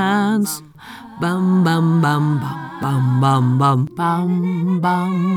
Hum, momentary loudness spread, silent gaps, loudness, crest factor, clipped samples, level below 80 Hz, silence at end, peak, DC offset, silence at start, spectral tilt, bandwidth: none; 10 LU; none; -17 LUFS; 14 dB; under 0.1%; -58 dBFS; 0 s; -4 dBFS; under 0.1%; 0 s; -7 dB/octave; 19.5 kHz